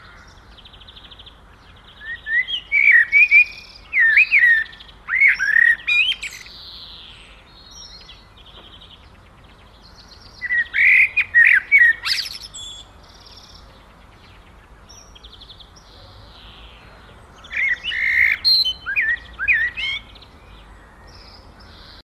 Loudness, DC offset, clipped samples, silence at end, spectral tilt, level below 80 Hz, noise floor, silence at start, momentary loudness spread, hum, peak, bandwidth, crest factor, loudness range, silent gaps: -14 LUFS; under 0.1%; under 0.1%; 2.05 s; 0 dB/octave; -48 dBFS; -46 dBFS; 2 s; 24 LU; none; -4 dBFS; 14.5 kHz; 18 dB; 12 LU; none